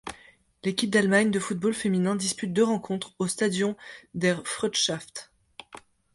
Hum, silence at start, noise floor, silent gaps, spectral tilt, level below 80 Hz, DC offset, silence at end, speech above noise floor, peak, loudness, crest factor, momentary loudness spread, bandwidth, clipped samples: none; 0.05 s; -56 dBFS; none; -4 dB/octave; -64 dBFS; under 0.1%; 0.35 s; 30 dB; -8 dBFS; -26 LUFS; 20 dB; 18 LU; 11.5 kHz; under 0.1%